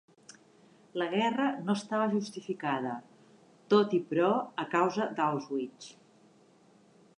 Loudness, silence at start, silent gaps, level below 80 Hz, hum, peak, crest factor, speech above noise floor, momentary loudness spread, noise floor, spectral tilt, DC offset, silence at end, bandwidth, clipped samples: -31 LUFS; 0.95 s; none; -86 dBFS; none; -12 dBFS; 20 dB; 32 dB; 12 LU; -62 dBFS; -6 dB/octave; under 0.1%; 1.3 s; 10.5 kHz; under 0.1%